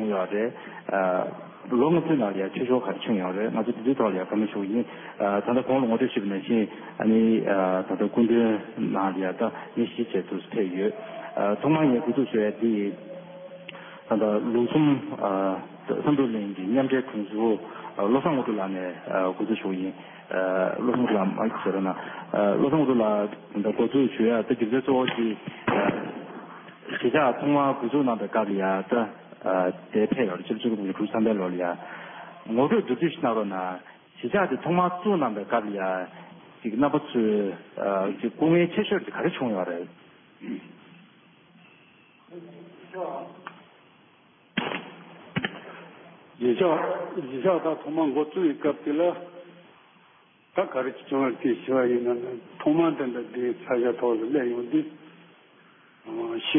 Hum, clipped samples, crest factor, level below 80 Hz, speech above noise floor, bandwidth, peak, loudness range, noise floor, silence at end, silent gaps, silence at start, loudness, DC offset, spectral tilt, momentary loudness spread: none; under 0.1%; 16 dB; -70 dBFS; 33 dB; 3.7 kHz; -10 dBFS; 5 LU; -58 dBFS; 0 s; none; 0 s; -26 LUFS; under 0.1%; -11 dB/octave; 14 LU